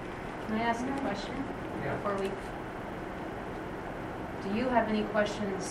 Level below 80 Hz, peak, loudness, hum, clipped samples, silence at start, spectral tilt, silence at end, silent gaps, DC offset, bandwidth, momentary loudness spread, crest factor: -52 dBFS; -12 dBFS; -34 LUFS; none; under 0.1%; 0 s; -5.5 dB/octave; 0 s; none; under 0.1%; 15 kHz; 10 LU; 22 dB